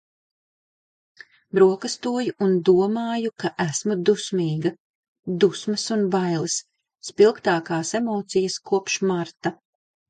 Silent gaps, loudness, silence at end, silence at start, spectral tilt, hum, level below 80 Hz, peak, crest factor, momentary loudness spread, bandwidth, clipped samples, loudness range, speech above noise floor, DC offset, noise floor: 4.80-5.23 s; -22 LUFS; 0.55 s; 1.55 s; -5 dB/octave; none; -68 dBFS; -4 dBFS; 18 dB; 10 LU; 9.4 kHz; under 0.1%; 2 LU; over 68 dB; under 0.1%; under -90 dBFS